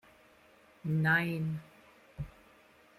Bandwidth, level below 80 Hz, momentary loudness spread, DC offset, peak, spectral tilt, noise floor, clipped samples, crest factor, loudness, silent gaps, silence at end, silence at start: 14.5 kHz; -62 dBFS; 18 LU; under 0.1%; -16 dBFS; -7.5 dB/octave; -62 dBFS; under 0.1%; 20 dB; -32 LUFS; none; 0.7 s; 0.85 s